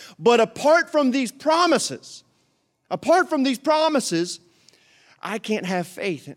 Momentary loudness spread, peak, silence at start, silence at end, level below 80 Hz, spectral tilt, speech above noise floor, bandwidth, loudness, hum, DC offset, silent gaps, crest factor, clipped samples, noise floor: 13 LU; -4 dBFS; 0 s; 0 s; -72 dBFS; -4 dB/octave; 47 dB; 16 kHz; -21 LUFS; none; under 0.1%; none; 18 dB; under 0.1%; -68 dBFS